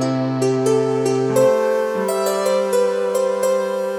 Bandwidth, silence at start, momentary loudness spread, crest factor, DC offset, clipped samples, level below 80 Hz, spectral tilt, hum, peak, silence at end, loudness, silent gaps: 17.5 kHz; 0 s; 4 LU; 12 dB; under 0.1%; under 0.1%; -64 dBFS; -5.5 dB/octave; none; -6 dBFS; 0 s; -18 LUFS; none